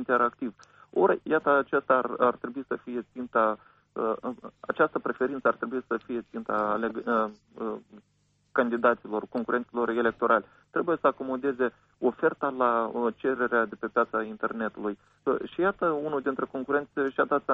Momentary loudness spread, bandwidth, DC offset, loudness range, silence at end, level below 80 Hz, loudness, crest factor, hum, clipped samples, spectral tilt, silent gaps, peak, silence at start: 11 LU; 6.2 kHz; under 0.1%; 3 LU; 0 s; -68 dBFS; -28 LUFS; 18 dB; none; under 0.1%; -8 dB/octave; none; -10 dBFS; 0 s